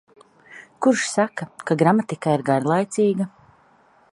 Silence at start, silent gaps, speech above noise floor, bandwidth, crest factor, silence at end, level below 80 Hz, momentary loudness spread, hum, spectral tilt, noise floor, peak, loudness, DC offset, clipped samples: 0.5 s; none; 36 dB; 11.5 kHz; 20 dB; 0.85 s; -68 dBFS; 8 LU; none; -5.5 dB/octave; -56 dBFS; -2 dBFS; -21 LUFS; under 0.1%; under 0.1%